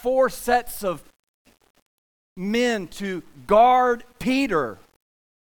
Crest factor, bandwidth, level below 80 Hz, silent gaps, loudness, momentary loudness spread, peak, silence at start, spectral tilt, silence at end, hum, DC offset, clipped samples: 18 dB; 19.5 kHz; -50 dBFS; 1.19-1.45 s, 1.70-1.75 s, 1.82-2.36 s; -22 LUFS; 15 LU; -4 dBFS; 0.05 s; -4.5 dB/octave; 0.7 s; none; under 0.1%; under 0.1%